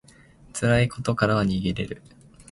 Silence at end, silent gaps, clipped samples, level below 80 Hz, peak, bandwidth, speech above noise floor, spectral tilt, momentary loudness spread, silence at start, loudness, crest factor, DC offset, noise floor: 0.1 s; none; under 0.1%; -44 dBFS; -6 dBFS; 11.5 kHz; 28 dB; -6 dB/octave; 14 LU; 0.55 s; -24 LUFS; 20 dB; under 0.1%; -52 dBFS